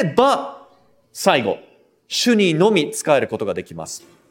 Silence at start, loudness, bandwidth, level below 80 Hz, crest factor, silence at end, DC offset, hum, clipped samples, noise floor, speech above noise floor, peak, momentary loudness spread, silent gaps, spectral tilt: 0 s; -18 LUFS; 17 kHz; -60 dBFS; 18 dB; 0.3 s; under 0.1%; none; under 0.1%; -55 dBFS; 37 dB; 0 dBFS; 16 LU; none; -4.5 dB/octave